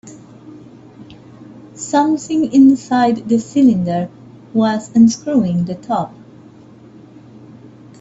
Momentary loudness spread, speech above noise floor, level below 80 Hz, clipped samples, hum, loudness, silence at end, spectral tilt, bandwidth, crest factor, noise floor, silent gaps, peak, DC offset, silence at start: 11 LU; 27 dB; -56 dBFS; under 0.1%; none; -15 LUFS; 0.65 s; -6.5 dB/octave; 8 kHz; 16 dB; -41 dBFS; none; -2 dBFS; under 0.1%; 0.05 s